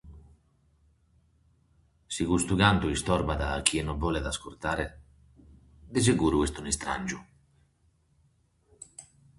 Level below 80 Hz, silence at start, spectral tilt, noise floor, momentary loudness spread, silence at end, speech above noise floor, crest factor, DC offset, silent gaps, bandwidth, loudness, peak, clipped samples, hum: -42 dBFS; 0.05 s; -4.5 dB/octave; -68 dBFS; 18 LU; 0.35 s; 40 dB; 28 dB; under 0.1%; none; 12 kHz; -28 LUFS; -2 dBFS; under 0.1%; none